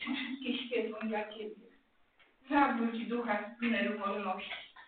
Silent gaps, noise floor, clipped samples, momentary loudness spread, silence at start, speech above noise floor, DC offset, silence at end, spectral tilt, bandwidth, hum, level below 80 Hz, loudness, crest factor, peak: none; -68 dBFS; under 0.1%; 11 LU; 0 s; 34 dB; under 0.1%; 0 s; -2 dB/octave; 4.6 kHz; none; -74 dBFS; -35 LUFS; 20 dB; -16 dBFS